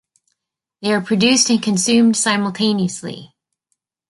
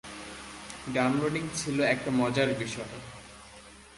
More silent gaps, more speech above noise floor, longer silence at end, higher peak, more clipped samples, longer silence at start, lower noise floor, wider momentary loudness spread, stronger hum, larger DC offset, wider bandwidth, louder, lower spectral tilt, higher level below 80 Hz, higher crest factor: neither; first, 60 dB vs 22 dB; first, 0.85 s vs 0 s; first, -2 dBFS vs -12 dBFS; neither; first, 0.8 s vs 0.05 s; first, -76 dBFS vs -51 dBFS; second, 14 LU vs 20 LU; neither; neither; about the same, 11.5 kHz vs 11.5 kHz; first, -16 LUFS vs -29 LUFS; second, -3.5 dB/octave vs -5 dB/octave; about the same, -62 dBFS vs -58 dBFS; about the same, 16 dB vs 20 dB